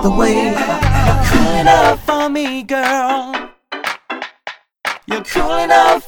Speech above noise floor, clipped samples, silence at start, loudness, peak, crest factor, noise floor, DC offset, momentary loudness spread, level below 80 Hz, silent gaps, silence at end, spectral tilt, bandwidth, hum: 21 dB; under 0.1%; 0 s; -15 LUFS; 0 dBFS; 14 dB; -34 dBFS; under 0.1%; 15 LU; -24 dBFS; none; 0 s; -5 dB/octave; 19.5 kHz; none